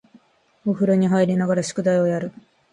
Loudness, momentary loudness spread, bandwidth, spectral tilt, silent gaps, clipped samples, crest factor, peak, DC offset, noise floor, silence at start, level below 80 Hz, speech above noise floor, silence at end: -21 LUFS; 10 LU; 11 kHz; -7 dB/octave; none; under 0.1%; 14 dB; -6 dBFS; under 0.1%; -56 dBFS; 0.65 s; -64 dBFS; 36 dB; 0.45 s